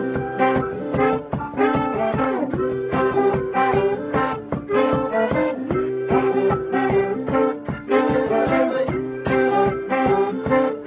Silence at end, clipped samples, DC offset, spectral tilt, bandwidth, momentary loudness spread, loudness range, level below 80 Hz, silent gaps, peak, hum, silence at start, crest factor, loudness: 0 s; under 0.1%; under 0.1%; -11 dB/octave; 4 kHz; 5 LU; 1 LU; -44 dBFS; none; -6 dBFS; none; 0 s; 14 dB; -21 LUFS